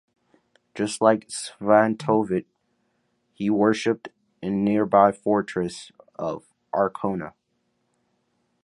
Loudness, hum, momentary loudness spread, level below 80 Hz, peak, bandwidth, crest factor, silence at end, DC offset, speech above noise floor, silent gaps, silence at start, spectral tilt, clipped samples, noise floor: -23 LUFS; none; 14 LU; -62 dBFS; -4 dBFS; 11.5 kHz; 22 dB; 1.35 s; under 0.1%; 50 dB; none; 0.75 s; -5.5 dB/octave; under 0.1%; -72 dBFS